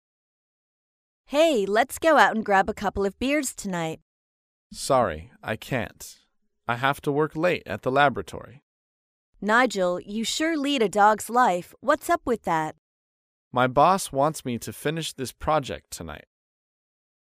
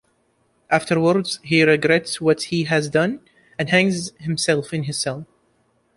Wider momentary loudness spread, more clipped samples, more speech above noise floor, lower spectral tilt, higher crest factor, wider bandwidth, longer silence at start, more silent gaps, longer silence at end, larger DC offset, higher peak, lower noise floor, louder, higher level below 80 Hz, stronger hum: first, 16 LU vs 10 LU; neither; first, over 66 dB vs 45 dB; about the same, -4 dB/octave vs -4.5 dB/octave; about the same, 20 dB vs 18 dB; first, 15.5 kHz vs 11.5 kHz; first, 1.3 s vs 0.7 s; first, 4.02-4.70 s, 8.62-9.33 s, 12.78-13.51 s vs none; first, 1.15 s vs 0.75 s; neither; about the same, -4 dBFS vs -2 dBFS; first, under -90 dBFS vs -64 dBFS; second, -24 LUFS vs -20 LUFS; first, -52 dBFS vs -58 dBFS; neither